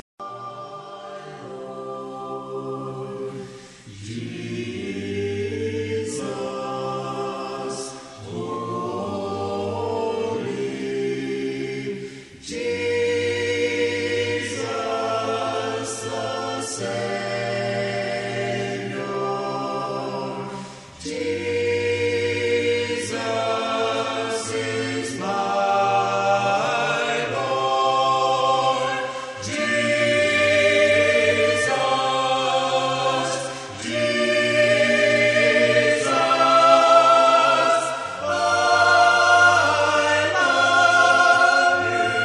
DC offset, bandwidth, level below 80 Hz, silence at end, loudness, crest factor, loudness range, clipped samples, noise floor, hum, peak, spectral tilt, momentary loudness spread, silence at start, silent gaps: under 0.1%; 11.5 kHz; -62 dBFS; 0 s; -20 LUFS; 20 dB; 13 LU; under 0.1%; -41 dBFS; none; -2 dBFS; -3.5 dB/octave; 17 LU; 0.2 s; none